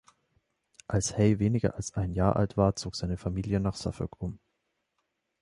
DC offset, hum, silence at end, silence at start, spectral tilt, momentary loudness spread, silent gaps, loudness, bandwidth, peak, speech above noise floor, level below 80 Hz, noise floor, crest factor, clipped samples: under 0.1%; none; 1.05 s; 0.9 s; -6.5 dB/octave; 10 LU; none; -29 LUFS; 11.5 kHz; -10 dBFS; 52 dB; -46 dBFS; -80 dBFS; 20 dB; under 0.1%